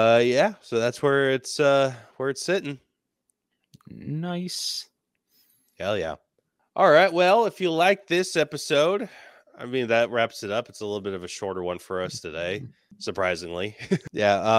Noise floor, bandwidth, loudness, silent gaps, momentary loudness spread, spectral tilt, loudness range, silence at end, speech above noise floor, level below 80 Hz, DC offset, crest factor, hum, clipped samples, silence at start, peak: -76 dBFS; 15.5 kHz; -24 LUFS; none; 14 LU; -4.5 dB/octave; 11 LU; 0 s; 53 dB; -64 dBFS; under 0.1%; 20 dB; none; under 0.1%; 0 s; -4 dBFS